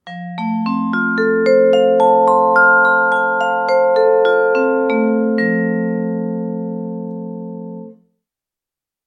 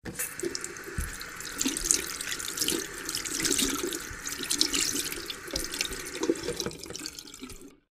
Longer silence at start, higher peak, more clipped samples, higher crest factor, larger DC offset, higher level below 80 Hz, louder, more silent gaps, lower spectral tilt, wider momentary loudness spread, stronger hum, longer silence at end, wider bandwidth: about the same, 0.05 s vs 0.05 s; about the same, -2 dBFS vs 0 dBFS; neither; second, 14 dB vs 32 dB; neither; second, -66 dBFS vs -48 dBFS; first, -14 LUFS vs -30 LUFS; neither; first, -7.5 dB/octave vs -1.5 dB/octave; first, 16 LU vs 12 LU; neither; first, 1.15 s vs 0.15 s; second, 9.2 kHz vs 16 kHz